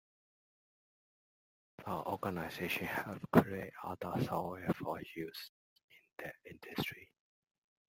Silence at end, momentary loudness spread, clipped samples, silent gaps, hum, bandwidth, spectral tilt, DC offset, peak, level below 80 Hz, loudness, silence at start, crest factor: 0.85 s; 18 LU; under 0.1%; 5.49-5.76 s, 5.83-5.88 s; none; 16.5 kHz; -6.5 dB/octave; under 0.1%; -10 dBFS; -70 dBFS; -38 LUFS; 1.8 s; 30 dB